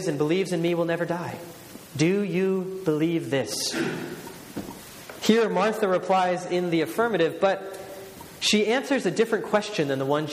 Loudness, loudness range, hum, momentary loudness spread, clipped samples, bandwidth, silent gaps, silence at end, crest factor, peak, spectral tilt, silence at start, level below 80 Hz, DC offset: -25 LUFS; 3 LU; none; 16 LU; under 0.1%; 15.5 kHz; none; 0 s; 20 dB; -6 dBFS; -4.5 dB/octave; 0 s; -64 dBFS; under 0.1%